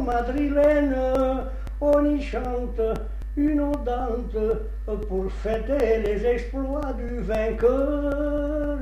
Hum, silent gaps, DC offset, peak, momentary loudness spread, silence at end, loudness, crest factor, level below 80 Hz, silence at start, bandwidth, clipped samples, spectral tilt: none; none; under 0.1%; -8 dBFS; 9 LU; 0 s; -25 LUFS; 14 dB; -30 dBFS; 0 s; 8.8 kHz; under 0.1%; -8 dB/octave